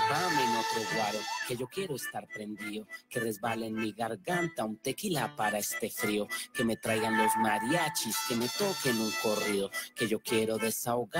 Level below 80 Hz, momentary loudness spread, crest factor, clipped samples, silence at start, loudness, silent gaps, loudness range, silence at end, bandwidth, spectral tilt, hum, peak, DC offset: -68 dBFS; 8 LU; 16 dB; under 0.1%; 0 s; -32 LUFS; none; 6 LU; 0 s; 16 kHz; -3.5 dB/octave; none; -16 dBFS; under 0.1%